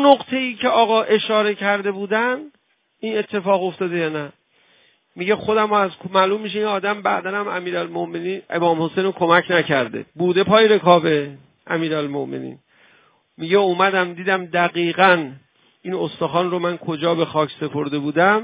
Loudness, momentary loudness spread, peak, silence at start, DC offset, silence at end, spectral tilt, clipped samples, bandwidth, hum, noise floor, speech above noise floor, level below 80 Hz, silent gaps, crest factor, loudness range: -19 LUFS; 11 LU; 0 dBFS; 0 s; under 0.1%; 0 s; -9.5 dB/octave; under 0.1%; 4 kHz; none; -58 dBFS; 39 dB; -62 dBFS; none; 20 dB; 5 LU